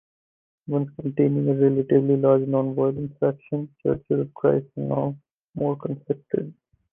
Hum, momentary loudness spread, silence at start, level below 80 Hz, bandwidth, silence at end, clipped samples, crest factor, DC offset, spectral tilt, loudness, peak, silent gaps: none; 11 LU; 0.7 s; -60 dBFS; 3.5 kHz; 0.4 s; under 0.1%; 18 dB; under 0.1%; -12.5 dB/octave; -24 LUFS; -6 dBFS; 5.31-5.53 s